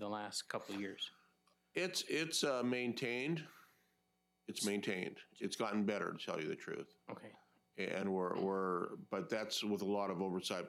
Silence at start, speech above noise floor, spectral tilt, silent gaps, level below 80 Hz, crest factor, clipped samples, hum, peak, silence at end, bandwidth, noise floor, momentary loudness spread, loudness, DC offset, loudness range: 0 s; 41 dB; -4 dB/octave; none; under -90 dBFS; 20 dB; under 0.1%; none; -22 dBFS; 0 s; 16 kHz; -82 dBFS; 11 LU; -40 LUFS; under 0.1%; 2 LU